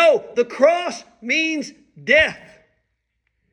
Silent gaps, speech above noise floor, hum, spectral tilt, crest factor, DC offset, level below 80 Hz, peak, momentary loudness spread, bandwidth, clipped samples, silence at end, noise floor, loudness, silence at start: none; 53 dB; none; -3 dB/octave; 18 dB; under 0.1%; -54 dBFS; -2 dBFS; 17 LU; 10.5 kHz; under 0.1%; 1.15 s; -73 dBFS; -18 LUFS; 0 s